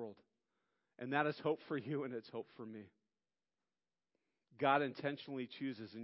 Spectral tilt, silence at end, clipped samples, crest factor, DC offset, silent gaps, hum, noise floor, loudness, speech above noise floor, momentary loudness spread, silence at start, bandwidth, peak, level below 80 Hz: -4 dB/octave; 0 s; under 0.1%; 24 dB; under 0.1%; none; none; under -90 dBFS; -40 LUFS; over 49 dB; 17 LU; 0 s; 5.6 kHz; -18 dBFS; -90 dBFS